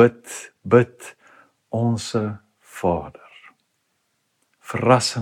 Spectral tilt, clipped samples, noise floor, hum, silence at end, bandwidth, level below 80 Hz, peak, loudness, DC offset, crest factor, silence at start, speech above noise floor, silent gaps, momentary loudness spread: -5.5 dB/octave; under 0.1%; -71 dBFS; none; 0 s; 15 kHz; -56 dBFS; 0 dBFS; -21 LUFS; under 0.1%; 22 dB; 0 s; 51 dB; none; 22 LU